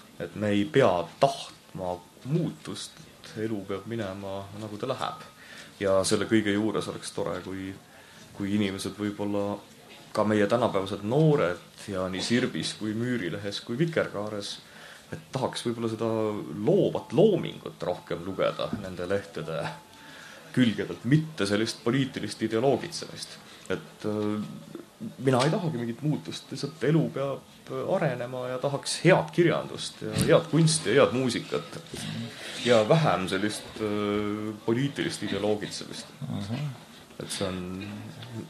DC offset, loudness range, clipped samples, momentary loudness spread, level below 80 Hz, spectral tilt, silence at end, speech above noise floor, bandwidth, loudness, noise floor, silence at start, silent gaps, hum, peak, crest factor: under 0.1%; 7 LU; under 0.1%; 16 LU; -64 dBFS; -5.5 dB/octave; 0 s; 22 dB; 13.5 kHz; -28 LUFS; -49 dBFS; 0.05 s; none; none; -6 dBFS; 22 dB